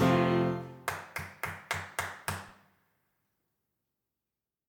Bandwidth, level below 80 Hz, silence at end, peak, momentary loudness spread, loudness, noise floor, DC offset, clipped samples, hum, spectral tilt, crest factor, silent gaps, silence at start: 19.5 kHz; -64 dBFS; 2.15 s; -14 dBFS; 14 LU; -33 LUFS; under -90 dBFS; under 0.1%; under 0.1%; none; -5.5 dB/octave; 20 dB; none; 0 s